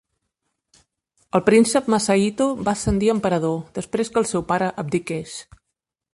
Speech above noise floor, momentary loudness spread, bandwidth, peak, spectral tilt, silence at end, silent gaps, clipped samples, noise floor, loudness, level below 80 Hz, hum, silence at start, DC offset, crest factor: 61 dB; 12 LU; 11.5 kHz; -4 dBFS; -5 dB/octave; 0.75 s; none; under 0.1%; -81 dBFS; -21 LUFS; -44 dBFS; none; 1.35 s; under 0.1%; 18 dB